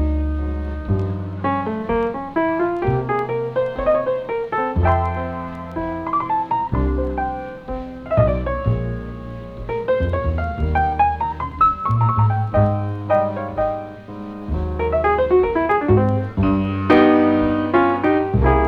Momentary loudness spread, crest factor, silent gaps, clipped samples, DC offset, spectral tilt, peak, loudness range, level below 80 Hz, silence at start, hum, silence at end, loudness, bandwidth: 11 LU; 18 dB; none; under 0.1%; under 0.1%; -10 dB/octave; -2 dBFS; 6 LU; -30 dBFS; 0 s; none; 0 s; -20 LUFS; 5.4 kHz